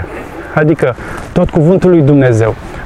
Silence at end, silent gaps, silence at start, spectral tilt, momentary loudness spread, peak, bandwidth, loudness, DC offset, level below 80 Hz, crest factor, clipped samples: 0 s; none; 0 s; -8.5 dB/octave; 13 LU; 0 dBFS; 11.5 kHz; -10 LUFS; under 0.1%; -30 dBFS; 10 dB; under 0.1%